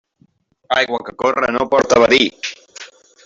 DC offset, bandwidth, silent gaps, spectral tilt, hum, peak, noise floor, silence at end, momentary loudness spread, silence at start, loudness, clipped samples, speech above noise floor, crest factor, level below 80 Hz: under 0.1%; 7.8 kHz; none; -3 dB/octave; none; -2 dBFS; -57 dBFS; 0.4 s; 21 LU; 0.7 s; -15 LUFS; under 0.1%; 42 dB; 16 dB; -52 dBFS